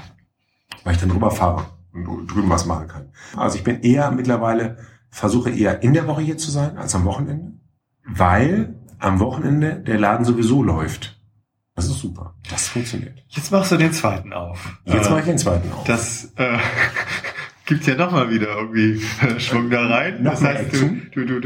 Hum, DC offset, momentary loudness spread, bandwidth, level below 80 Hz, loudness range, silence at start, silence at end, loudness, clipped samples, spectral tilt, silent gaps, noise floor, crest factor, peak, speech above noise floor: none; under 0.1%; 14 LU; 16.5 kHz; -40 dBFS; 3 LU; 0 s; 0 s; -19 LUFS; under 0.1%; -5.5 dB/octave; none; -64 dBFS; 18 dB; -2 dBFS; 45 dB